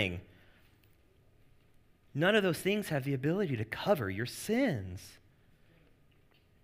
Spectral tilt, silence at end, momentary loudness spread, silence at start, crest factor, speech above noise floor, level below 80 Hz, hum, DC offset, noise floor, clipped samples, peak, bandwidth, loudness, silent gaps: -5.5 dB/octave; 1.45 s; 16 LU; 0 s; 22 dB; 33 dB; -66 dBFS; none; under 0.1%; -65 dBFS; under 0.1%; -14 dBFS; 15.5 kHz; -32 LUFS; none